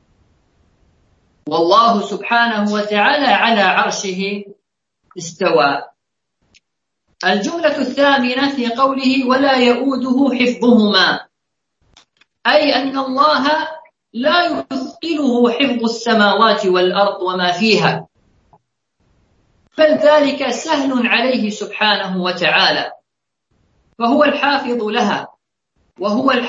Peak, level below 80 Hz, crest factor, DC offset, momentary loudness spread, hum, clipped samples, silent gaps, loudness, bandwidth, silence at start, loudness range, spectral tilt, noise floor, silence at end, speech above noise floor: 0 dBFS; -64 dBFS; 16 dB; under 0.1%; 10 LU; none; under 0.1%; none; -15 LUFS; 7.8 kHz; 1.45 s; 4 LU; -4.5 dB/octave; -78 dBFS; 0 s; 63 dB